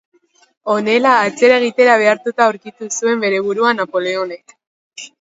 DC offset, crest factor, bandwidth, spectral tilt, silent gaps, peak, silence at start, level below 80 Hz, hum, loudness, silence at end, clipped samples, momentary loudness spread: under 0.1%; 16 dB; 8 kHz; -3 dB/octave; 4.67-4.91 s; 0 dBFS; 0.65 s; -68 dBFS; none; -14 LUFS; 0.15 s; under 0.1%; 16 LU